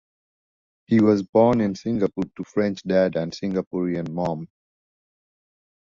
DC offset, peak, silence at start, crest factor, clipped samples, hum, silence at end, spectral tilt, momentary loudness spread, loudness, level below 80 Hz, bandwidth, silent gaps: under 0.1%; -4 dBFS; 0.9 s; 20 dB; under 0.1%; none; 1.4 s; -7.5 dB/octave; 9 LU; -22 LUFS; -56 dBFS; 7.4 kHz; 1.29-1.33 s, 3.67-3.71 s